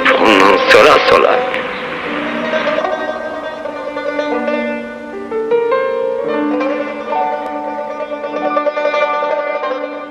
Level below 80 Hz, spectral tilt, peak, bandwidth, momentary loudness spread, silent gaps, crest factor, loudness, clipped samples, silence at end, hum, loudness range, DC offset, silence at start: -50 dBFS; -4 dB/octave; 0 dBFS; 15.5 kHz; 14 LU; none; 14 dB; -15 LUFS; under 0.1%; 0 s; none; 7 LU; under 0.1%; 0 s